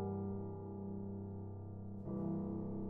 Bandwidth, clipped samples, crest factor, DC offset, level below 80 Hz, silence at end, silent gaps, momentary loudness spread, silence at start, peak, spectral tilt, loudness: 2.1 kHz; under 0.1%; 12 dB; under 0.1%; -64 dBFS; 0 s; none; 7 LU; 0 s; -30 dBFS; -14 dB/octave; -45 LUFS